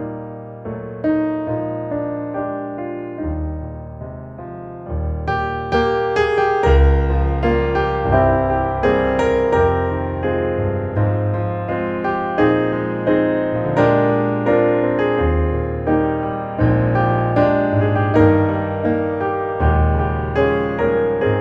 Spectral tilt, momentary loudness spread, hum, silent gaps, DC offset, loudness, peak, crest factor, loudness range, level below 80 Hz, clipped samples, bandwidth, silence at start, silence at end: -9 dB/octave; 12 LU; none; none; under 0.1%; -18 LUFS; -2 dBFS; 16 dB; 7 LU; -26 dBFS; under 0.1%; 7.4 kHz; 0 s; 0 s